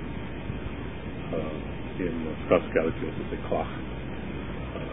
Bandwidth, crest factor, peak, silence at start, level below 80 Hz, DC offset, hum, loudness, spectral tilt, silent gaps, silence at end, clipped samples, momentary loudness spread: 3.9 kHz; 26 dB; -6 dBFS; 0 s; -42 dBFS; 0.9%; none; -31 LUFS; -11 dB/octave; none; 0 s; under 0.1%; 11 LU